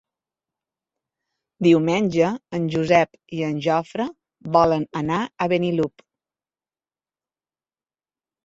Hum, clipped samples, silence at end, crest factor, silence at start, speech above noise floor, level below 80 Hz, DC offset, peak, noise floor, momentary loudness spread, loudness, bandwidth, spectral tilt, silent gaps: none; under 0.1%; 2.6 s; 20 dB; 1.6 s; over 70 dB; -58 dBFS; under 0.1%; -2 dBFS; under -90 dBFS; 10 LU; -21 LUFS; 7.8 kHz; -7 dB/octave; none